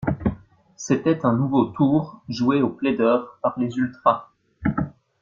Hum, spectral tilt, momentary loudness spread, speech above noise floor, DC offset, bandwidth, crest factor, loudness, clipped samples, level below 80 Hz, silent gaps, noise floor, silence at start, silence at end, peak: none; -7 dB/octave; 9 LU; 21 dB; under 0.1%; 7.4 kHz; 20 dB; -22 LUFS; under 0.1%; -48 dBFS; none; -42 dBFS; 0 s; 0.3 s; -2 dBFS